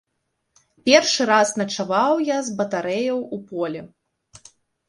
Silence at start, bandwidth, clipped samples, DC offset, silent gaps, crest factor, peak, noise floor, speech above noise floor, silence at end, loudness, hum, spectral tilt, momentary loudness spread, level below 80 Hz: 0.85 s; 11.5 kHz; under 0.1%; under 0.1%; none; 22 dB; 0 dBFS; -75 dBFS; 55 dB; 1 s; -20 LUFS; none; -3 dB/octave; 12 LU; -66 dBFS